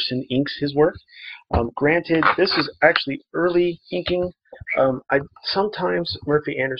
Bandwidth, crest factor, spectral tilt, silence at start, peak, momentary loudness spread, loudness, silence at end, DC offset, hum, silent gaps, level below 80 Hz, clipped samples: 5.8 kHz; 20 dB; -8 dB/octave; 0 s; 0 dBFS; 9 LU; -21 LUFS; 0 s; under 0.1%; none; none; -44 dBFS; under 0.1%